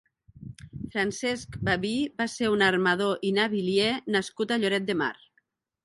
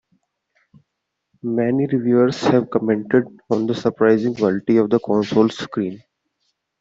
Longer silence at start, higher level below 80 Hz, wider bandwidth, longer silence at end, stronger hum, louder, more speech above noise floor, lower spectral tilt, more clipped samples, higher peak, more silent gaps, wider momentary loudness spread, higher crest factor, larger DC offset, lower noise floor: second, 0.4 s vs 1.45 s; first, -56 dBFS vs -62 dBFS; first, 11.5 kHz vs 7.8 kHz; second, 0.7 s vs 0.85 s; neither; second, -26 LUFS vs -19 LUFS; second, 45 dB vs 60 dB; second, -4.5 dB/octave vs -7 dB/octave; neither; second, -8 dBFS vs -2 dBFS; neither; first, 11 LU vs 8 LU; about the same, 20 dB vs 16 dB; neither; second, -71 dBFS vs -78 dBFS